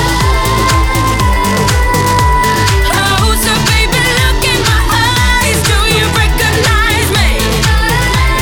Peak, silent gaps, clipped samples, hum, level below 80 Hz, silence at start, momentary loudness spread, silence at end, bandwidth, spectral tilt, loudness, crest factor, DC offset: -2 dBFS; none; under 0.1%; none; -16 dBFS; 0 s; 2 LU; 0 s; over 20 kHz; -3.5 dB/octave; -10 LUFS; 8 dB; under 0.1%